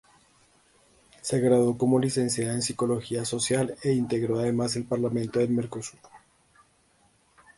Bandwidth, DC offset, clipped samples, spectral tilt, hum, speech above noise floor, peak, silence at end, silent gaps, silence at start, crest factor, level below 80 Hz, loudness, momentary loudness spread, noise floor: 11.5 kHz; under 0.1%; under 0.1%; -5.5 dB/octave; none; 38 dB; -10 dBFS; 1.4 s; none; 1.25 s; 18 dB; -62 dBFS; -26 LUFS; 7 LU; -64 dBFS